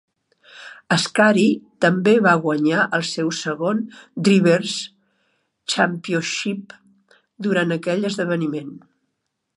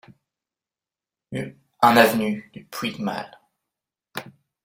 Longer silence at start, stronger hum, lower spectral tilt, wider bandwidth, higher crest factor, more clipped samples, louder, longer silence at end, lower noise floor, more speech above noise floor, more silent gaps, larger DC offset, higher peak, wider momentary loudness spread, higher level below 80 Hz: second, 0.55 s vs 1.3 s; neither; about the same, -5 dB/octave vs -4.5 dB/octave; second, 11.5 kHz vs 16.5 kHz; about the same, 20 dB vs 24 dB; neither; about the same, -19 LUFS vs -21 LUFS; first, 0.8 s vs 0.4 s; second, -76 dBFS vs under -90 dBFS; second, 57 dB vs over 69 dB; neither; neither; about the same, -2 dBFS vs -2 dBFS; second, 16 LU vs 21 LU; about the same, -70 dBFS vs -66 dBFS